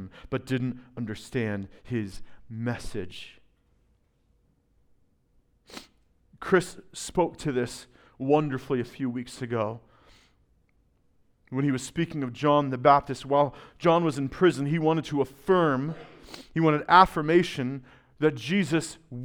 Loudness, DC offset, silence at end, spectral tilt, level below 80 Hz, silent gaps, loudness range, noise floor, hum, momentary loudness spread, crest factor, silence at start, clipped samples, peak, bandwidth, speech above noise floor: -26 LUFS; under 0.1%; 0 s; -6 dB/octave; -54 dBFS; none; 12 LU; -67 dBFS; none; 18 LU; 26 dB; 0 s; under 0.1%; -2 dBFS; 17 kHz; 41 dB